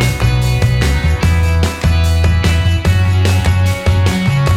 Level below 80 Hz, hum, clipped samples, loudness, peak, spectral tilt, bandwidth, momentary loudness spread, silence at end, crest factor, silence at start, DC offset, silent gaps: -18 dBFS; none; under 0.1%; -13 LUFS; -2 dBFS; -5.5 dB/octave; 15.5 kHz; 1 LU; 0 s; 10 dB; 0 s; under 0.1%; none